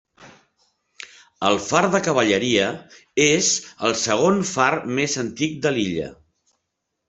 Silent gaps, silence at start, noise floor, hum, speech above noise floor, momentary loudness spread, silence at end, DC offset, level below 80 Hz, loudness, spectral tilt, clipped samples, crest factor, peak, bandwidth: none; 0.2 s; -78 dBFS; none; 58 dB; 15 LU; 0.95 s; under 0.1%; -60 dBFS; -20 LUFS; -3 dB/octave; under 0.1%; 20 dB; -2 dBFS; 8.4 kHz